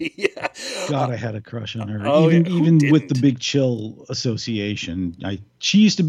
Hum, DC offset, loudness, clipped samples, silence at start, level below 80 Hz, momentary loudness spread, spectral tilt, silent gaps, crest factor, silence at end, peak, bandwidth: none; under 0.1%; -20 LUFS; under 0.1%; 0 s; -56 dBFS; 13 LU; -6 dB/octave; none; 16 dB; 0 s; -4 dBFS; 10.5 kHz